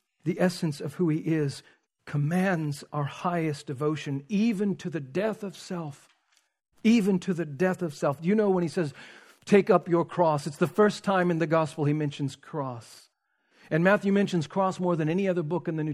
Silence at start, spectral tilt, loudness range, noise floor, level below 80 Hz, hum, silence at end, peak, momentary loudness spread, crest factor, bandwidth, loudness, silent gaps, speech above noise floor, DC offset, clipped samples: 0.25 s; -7 dB/octave; 5 LU; -71 dBFS; -72 dBFS; none; 0 s; -6 dBFS; 11 LU; 20 dB; 13.5 kHz; -27 LUFS; none; 45 dB; under 0.1%; under 0.1%